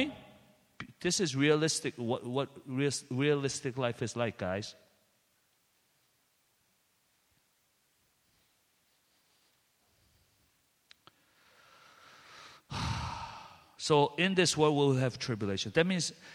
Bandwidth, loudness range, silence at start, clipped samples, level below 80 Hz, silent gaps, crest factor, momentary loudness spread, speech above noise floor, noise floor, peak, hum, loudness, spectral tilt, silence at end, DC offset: 14 kHz; 14 LU; 0 s; under 0.1%; -62 dBFS; none; 24 dB; 19 LU; 43 dB; -74 dBFS; -12 dBFS; none; -31 LUFS; -4.5 dB/octave; 0 s; under 0.1%